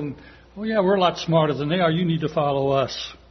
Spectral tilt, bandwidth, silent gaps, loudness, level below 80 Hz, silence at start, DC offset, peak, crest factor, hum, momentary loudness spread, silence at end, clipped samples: -6.5 dB/octave; 6.4 kHz; none; -22 LUFS; -52 dBFS; 0 s; under 0.1%; -6 dBFS; 16 dB; none; 12 LU; 0.15 s; under 0.1%